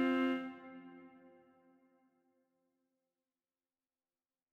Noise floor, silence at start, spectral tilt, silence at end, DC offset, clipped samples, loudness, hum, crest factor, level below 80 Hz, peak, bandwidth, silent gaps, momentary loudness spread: under -90 dBFS; 0 s; -5.5 dB/octave; 3.45 s; under 0.1%; under 0.1%; -37 LUFS; none; 20 dB; under -90 dBFS; -22 dBFS; 6 kHz; none; 24 LU